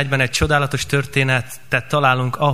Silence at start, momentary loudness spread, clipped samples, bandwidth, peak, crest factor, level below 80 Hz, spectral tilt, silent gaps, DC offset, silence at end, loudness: 0 s; 5 LU; under 0.1%; 15.5 kHz; -2 dBFS; 18 dB; -38 dBFS; -4.5 dB/octave; none; 1%; 0 s; -18 LUFS